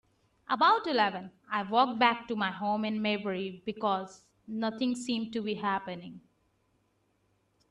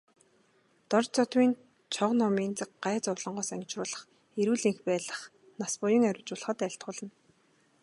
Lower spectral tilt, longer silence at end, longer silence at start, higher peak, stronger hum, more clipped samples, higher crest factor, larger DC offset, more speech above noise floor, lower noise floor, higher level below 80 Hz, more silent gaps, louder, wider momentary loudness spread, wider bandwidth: about the same, -5 dB/octave vs -4.5 dB/octave; first, 1.5 s vs 0.75 s; second, 0.5 s vs 0.9 s; about the same, -10 dBFS vs -10 dBFS; neither; neither; about the same, 22 dB vs 20 dB; neither; first, 43 dB vs 38 dB; first, -73 dBFS vs -68 dBFS; first, -74 dBFS vs -80 dBFS; neither; about the same, -30 LUFS vs -31 LUFS; about the same, 14 LU vs 14 LU; about the same, 11 kHz vs 11.5 kHz